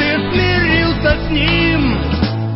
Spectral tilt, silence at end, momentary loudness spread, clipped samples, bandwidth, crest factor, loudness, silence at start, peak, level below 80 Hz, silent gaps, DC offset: -10 dB/octave; 0 s; 4 LU; under 0.1%; 5.8 kHz; 14 dB; -14 LUFS; 0 s; 0 dBFS; -24 dBFS; none; under 0.1%